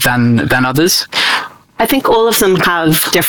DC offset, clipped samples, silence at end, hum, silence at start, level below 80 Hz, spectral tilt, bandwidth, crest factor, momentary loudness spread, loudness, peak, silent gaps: under 0.1%; under 0.1%; 0 s; none; 0 s; -40 dBFS; -3.5 dB/octave; 19.5 kHz; 10 dB; 5 LU; -11 LUFS; -2 dBFS; none